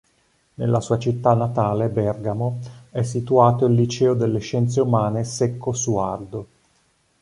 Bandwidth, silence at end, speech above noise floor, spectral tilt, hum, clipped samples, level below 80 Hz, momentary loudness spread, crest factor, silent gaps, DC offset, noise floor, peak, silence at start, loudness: 11 kHz; 0.75 s; 43 dB; -7 dB/octave; none; under 0.1%; -52 dBFS; 10 LU; 18 dB; none; under 0.1%; -63 dBFS; -2 dBFS; 0.6 s; -21 LUFS